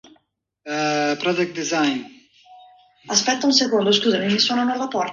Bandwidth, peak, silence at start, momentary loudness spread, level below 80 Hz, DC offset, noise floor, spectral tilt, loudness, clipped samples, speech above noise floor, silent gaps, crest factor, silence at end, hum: 7.6 kHz; -2 dBFS; 0.65 s; 6 LU; -68 dBFS; under 0.1%; -66 dBFS; -3 dB/octave; -20 LUFS; under 0.1%; 46 dB; none; 20 dB; 0 s; none